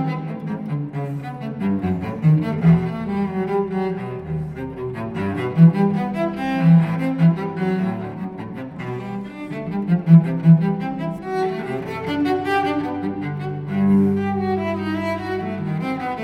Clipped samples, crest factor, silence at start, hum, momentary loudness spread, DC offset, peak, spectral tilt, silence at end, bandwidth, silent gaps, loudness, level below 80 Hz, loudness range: under 0.1%; 18 dB; 0 s; none; 14 LU; under 0.1%; -2 dBFS; -9.5 dB/octave; 0 s; 5.4 kHz; none; -21 LUFS; -50 dBFS; 4 LU